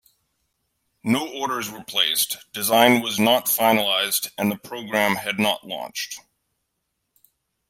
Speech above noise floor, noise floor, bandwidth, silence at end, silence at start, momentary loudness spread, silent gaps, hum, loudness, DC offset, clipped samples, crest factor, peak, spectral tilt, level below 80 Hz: 55 dB; -77 dBFS; 16.5 kHz; 1.5 s; 1.05 s; 13 LU; none; none; -21 LUFS; under 0.1%; under 0.1%; 22 dB; -2 dBFS; -2.5 dB/octave; -68 dBFS